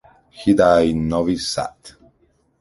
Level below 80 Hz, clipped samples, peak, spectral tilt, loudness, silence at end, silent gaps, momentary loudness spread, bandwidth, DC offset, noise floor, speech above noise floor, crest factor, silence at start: -42 dBFS; under 0.1%; -2 dBFS; -5.5 dB/octave; -18 LUFS; 0.7 s; none; 11 LU; 11.5 kHz; under 0.1%; -61 dBFS; 44 dB; 18 dB; 0.35 s